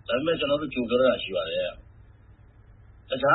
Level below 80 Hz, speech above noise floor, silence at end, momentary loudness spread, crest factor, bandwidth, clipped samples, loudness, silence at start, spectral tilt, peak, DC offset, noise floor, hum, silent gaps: -54 dBFS; 27 dB; 0 s; 9 LU; 18 dB; 4.1 kHz; under 0.1%; -26 LUFS; 0.1 s; -9.5 dB/octave; -8 dBFS; under 0.1%; -52 dBFS; none; none